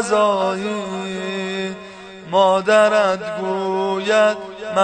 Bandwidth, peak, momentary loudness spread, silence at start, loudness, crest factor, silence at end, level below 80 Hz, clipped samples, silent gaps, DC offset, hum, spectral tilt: 9.4 kHz; -2 dBFS; 13 LU; 0 s; -19 LUFS; 16 dB; 0 s; -62 dBFS; under 0.1%; none; under 0.1%; none; -4.5 dB/octave